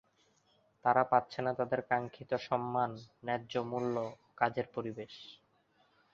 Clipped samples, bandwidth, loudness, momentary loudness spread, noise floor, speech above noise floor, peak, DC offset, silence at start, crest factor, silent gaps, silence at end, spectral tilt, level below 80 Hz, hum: under 0.1%; 7.2 kHz; -35 LUFS; 14 LU; -72 dBFS; 37 dB; -12 dBFS; under 0.1%; 0.85 s; 24 dB; none; 0.8 s; -4.5 dB/octave; -74 dBFS; none